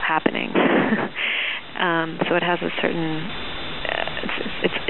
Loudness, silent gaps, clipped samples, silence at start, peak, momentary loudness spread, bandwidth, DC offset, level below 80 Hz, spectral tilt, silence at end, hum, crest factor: -23 LUFS; none; under 0.1%; 0 s; 0 dBFS; 8 LU; 4.3 kHz; 1%; -50 dBFS; -2.5 dB/octave; 0 s; none; 22 dB